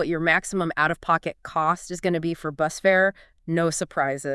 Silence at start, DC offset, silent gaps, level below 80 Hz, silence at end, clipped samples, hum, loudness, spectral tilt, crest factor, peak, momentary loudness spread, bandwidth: 0 s; under 0.1%; none; -54 dBFS; 0 s; under 0.1%; none; -24 LUFS; -4.5 dB/octave; 18 dB; -6 dBFS; 7 LU; 12 kHz